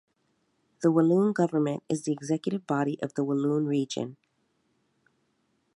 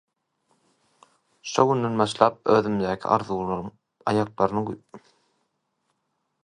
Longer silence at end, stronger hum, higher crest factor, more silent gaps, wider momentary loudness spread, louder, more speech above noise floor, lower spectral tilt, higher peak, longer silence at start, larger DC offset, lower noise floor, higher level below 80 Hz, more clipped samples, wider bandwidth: first, 1.6 s vs 1.45 s; neither; second, 18 dB vs 26 dB; neither; second, 8 LU vs 12 LU; second, -27 LUFS vs -24 LUFS; second, 47 dB vs 53 dB; about the same, -7 dB/octave vs -6 dB/octave; second, -10 dBFS vs 0 dBFS; second, 0.8 s vs 1.45 s; neither; about the same, -73 dBFS vs -76 dBFS; second, -78 dBFS vs -58 dBFS; neither; about the same, 11.5 kHz vs 10.5 kHz